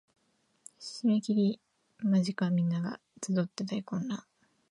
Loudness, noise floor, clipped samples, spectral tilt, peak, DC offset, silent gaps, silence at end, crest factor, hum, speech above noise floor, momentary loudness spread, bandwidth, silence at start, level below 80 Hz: -32 LUFS; -73 dBFS; under 0.1%; -6.5 dB/octave; -16 dBFS; under 0.1%; none; 0.5 s; 16 dB; none; 44 dB; 13 LU; 11 kHz; 0.8 s; -80 dBFS